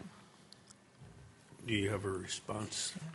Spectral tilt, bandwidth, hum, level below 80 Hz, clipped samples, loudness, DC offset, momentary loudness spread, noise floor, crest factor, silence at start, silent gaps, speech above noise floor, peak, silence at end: -4 dB/octave; 11.5 kHz; none; -68 dBFS; under 0.1%; -38 LUFS; under 0.1%; 23 LU; -61 dBFS; 22 dB; 0 s; none; 22 dB; -20 dBFS; 0 s